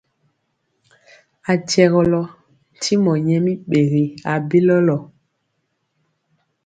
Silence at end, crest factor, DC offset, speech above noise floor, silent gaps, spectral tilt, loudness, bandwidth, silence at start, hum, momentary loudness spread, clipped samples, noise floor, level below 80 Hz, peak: 1.6 s; 18 dB; under 0.1%; 55 dB; none; -6.5 dB/octave; -17 LUFS; 9.2 kHz; 1.45 s; none; 10 LU; under 0.1%; -71 dBFS; -54 dBFS; 0 dBFS